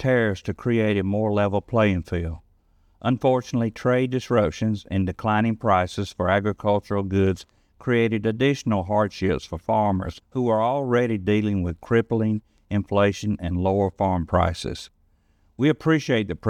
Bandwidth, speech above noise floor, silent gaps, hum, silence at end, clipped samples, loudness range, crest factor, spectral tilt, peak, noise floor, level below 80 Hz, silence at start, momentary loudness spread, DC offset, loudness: 11.5 kHz; 40 dB; none; none; 0 s; under 0.1%; 1 LU; 16 dB; -7 dB/octave; -6 dBFS; -62 dBFS; -48 dBFS; 0 s; 7 LU; under 0.1%; -23 LUFS